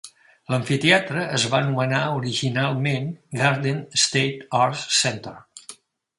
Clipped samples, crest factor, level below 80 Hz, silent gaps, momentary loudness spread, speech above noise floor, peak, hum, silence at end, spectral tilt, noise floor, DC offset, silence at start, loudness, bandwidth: under 0.1%; 22 dB; -62 dBFS; none; 11 LU; 24 dB; -2 dBFS; none; 0.45 s; -3.5 dB/octave; -46 dBFS; under 0.1%; 0.05 s; -21 LUFS; 11.5 kHz